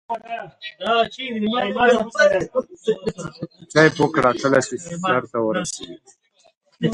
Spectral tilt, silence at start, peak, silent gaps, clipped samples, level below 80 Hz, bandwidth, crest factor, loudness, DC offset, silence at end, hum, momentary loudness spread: -4.5 dB/octave; 0.1 s; 0 dBFS; 6.57-6.61 s; under 0.1%; -56 dBFS; 11.5 kHz; 20 dB; -20 LUFS; under 0.1%; 0 s; none; 16 LU